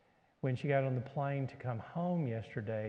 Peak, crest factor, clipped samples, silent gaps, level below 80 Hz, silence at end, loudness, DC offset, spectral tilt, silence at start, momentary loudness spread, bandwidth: -18 dBFS; 18 dB; under 0.1%; none; -74 dBFS; 0 s; -37 LUFS; under 0.1%; -9.5 dB/octave; 0.45 s; 7 LU; 6.4 kHz